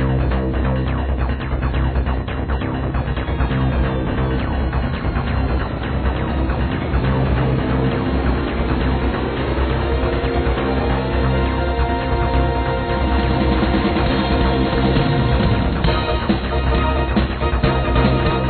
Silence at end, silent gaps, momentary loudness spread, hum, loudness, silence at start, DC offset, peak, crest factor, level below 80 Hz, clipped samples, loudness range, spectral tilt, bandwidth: 0 s; none; 5 LU; none; -19 LUFS; 0 s; under 0.1%; -2 dBFS; 16 dB; -22 dBFS; under 0.1%; 3 LU; -10.5 dB/octave; 4.5 kHz